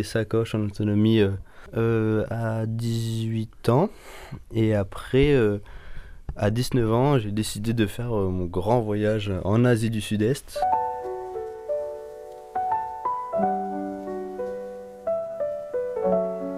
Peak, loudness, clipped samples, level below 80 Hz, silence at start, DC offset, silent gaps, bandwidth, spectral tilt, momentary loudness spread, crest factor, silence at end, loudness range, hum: -8 dBFS; -25 LUFS; under 0.1%; -44 dBFS; 0 s; under 0.1%; none; 15.5 kHz; -7 dB/octave; 13 LU; 16 dB; 0 s; 5 LU; none